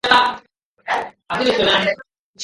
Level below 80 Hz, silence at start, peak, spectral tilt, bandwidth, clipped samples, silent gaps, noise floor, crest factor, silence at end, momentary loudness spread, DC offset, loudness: -52 dBFS; 0.05 s; 0 dBFS; -3 dB/octave; 11.5 kHz; under 0.1%; 0.65-0.75 s, 2.19-2.34 s; -50 dBFS; 20 dB; 0 s; 16 LU; under 0.1%; -18 LUFS